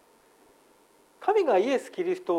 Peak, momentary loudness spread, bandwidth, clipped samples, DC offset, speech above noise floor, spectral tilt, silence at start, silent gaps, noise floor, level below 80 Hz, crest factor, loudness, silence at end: -12 dBFS; 8 LU; 13 kHz; under 0.1%; under 0.1%; 35 dB; -5 dB/octave; 1.2 s; none; -60 dBFS; -80 dBFS; 16 dB; -26 LUFS; 0 s